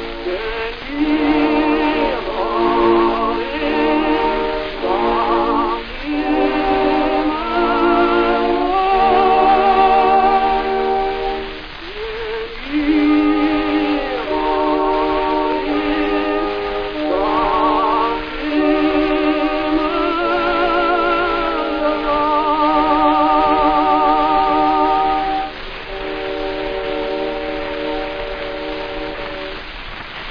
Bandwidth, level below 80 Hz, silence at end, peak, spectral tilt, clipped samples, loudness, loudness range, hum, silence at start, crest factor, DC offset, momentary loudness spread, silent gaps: 5.2 kHz; -34 dBFS; 0 s; -2 dBFS; -6.5 dB/octave; under 0.1%; -17 LUFS; 5 LU; none; 0 s; 14 dB; 0.7%; 11 LU; none